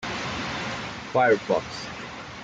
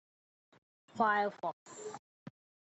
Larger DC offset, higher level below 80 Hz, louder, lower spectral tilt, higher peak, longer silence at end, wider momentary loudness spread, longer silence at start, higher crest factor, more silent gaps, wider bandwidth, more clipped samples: neither; first, -54 dBFS vs -86 dBFS; first, -26 LUFS vs -34 LUFS; about the same, -4.5 dB/octave vs -4.5 dB/octave; first, -10 dBFS vs -18 dBFS; second, 0 s vs 0.45 s; second, 14 LU vs 26 LU; second, 0 s vs 0.95 s; about the same, 18 dB vs 22 dB; second, none vs 1.53-1.66 s, 1.99-2.26 s; first, 9.2 kHz vs 8.2 kHz; neither